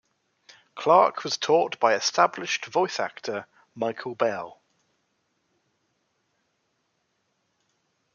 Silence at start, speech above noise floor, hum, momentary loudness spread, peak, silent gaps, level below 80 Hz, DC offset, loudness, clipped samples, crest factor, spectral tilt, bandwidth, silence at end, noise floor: 0.75 s; 50 dB; none; 14 LU; -4 dBFS; none; -82 dBFS; under 0.1%; -24 LUFS; under 0.1%; 24 dB; -3 dB/octave; 7.2 kHz; 3.65 s; -74 dBFS